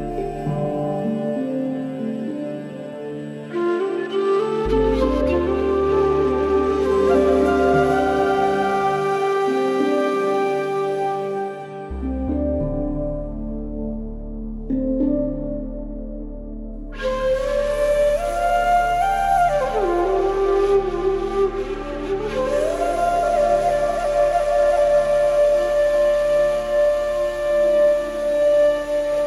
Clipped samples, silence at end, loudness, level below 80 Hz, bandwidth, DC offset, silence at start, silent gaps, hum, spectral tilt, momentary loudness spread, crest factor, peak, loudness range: under 0.1%; 0 s; -20 LUFS; -34 dBFS; 12.5 kHz; under 0.1%; 0 s; none; none; -6.5 dB/octave; 12 LU; 14 dB; -6 dBFS; 8 LU